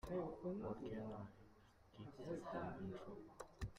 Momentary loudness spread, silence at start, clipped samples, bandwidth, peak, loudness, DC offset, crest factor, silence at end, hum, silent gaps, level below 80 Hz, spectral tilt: 12 LU; 0.05 s; under 0.1%; 15 kHz; -34 dBFS; -51 LUFS; under 0.1%; 16 dB; 0 s; none; none; -64 dBFS; -7.5 dB/octave